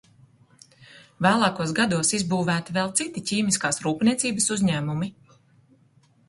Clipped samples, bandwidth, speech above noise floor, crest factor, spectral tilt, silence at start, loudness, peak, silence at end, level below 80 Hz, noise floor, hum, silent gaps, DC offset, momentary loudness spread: under 0.1%; 11.5 kHz; 36 dB; 20 dB; -4 dB/octave; 0.8 s; -23 LUFS; -4 dBFS; 1.2 s; -60 dBFS; -60 dBFS; none; none; under 0.1%; 5 LU